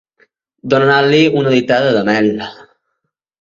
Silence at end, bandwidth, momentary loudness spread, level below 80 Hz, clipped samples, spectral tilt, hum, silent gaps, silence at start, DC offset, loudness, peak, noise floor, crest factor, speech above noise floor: 0.9 s; 7.6 kHz; 13 LU; -56 dBFS; under 0.1%; -6 dB/octave; none; none; 0.65 s; under 0.1%; -12 LUFS; 0 dBFS; -73 dBFS; 14 dB; 61 dB